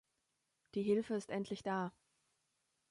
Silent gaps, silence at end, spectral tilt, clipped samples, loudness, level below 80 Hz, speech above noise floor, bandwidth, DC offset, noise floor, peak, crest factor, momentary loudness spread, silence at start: none; 1 s; -6.5 dB/octave; under 0.1%; -40 LUFS; -80 dBFS; 46 dB; 11.5 kHz; under 0.1%; -85 dBFS; -24 dBFS; 18 dB; 8 LU; 0.75 s